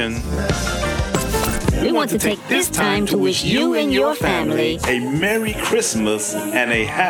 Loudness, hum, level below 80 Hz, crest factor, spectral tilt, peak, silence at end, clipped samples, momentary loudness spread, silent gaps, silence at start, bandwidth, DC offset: -18 LUFS; none; -32 dBFS; 18 dB; -4 dB/octave; 0 dBFS; 0 s; under 0.1%; 4 LU; none; 0 s; 20 kHz; under 0.1%